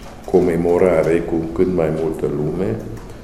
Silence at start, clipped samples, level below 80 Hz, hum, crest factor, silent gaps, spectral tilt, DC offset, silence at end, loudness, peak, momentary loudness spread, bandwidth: 0 s; under 0.1%; -38 dBFS; none; 18 dB; none; -8 dB/octave; under 0.1%; 0 s; -18 LUFS; 0 dBFS; 8 LU; 13.5 kHz